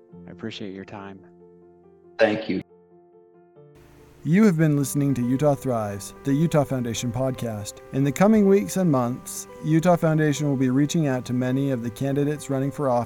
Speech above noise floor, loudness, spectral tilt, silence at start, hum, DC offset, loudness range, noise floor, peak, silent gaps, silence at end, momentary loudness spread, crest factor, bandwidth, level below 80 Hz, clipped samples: 31 dB; -23 LUFS; -6.5 dB/octave; 0.15 s; none; under 0.1%; 9 LU; -53 dBFS; -6 dBFS; none; 0 s; 15 LU; 18 dB; 18 kHz; -54 dBFS; under 0.1%